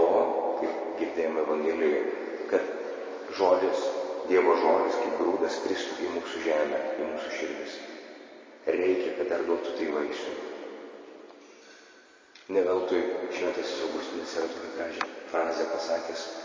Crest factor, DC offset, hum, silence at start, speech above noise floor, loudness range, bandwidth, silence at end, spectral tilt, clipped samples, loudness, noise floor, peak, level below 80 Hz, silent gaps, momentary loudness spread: 20 dB; under 0.1%; none; 0 s; 27 dB; 6 LU; 7.6 kHz; 0 s; -3.5 dB/octave; under 0.1%; -29 LUFS; -55 dBFS; -10 dBFS; -70 dBFS; none; 13 LU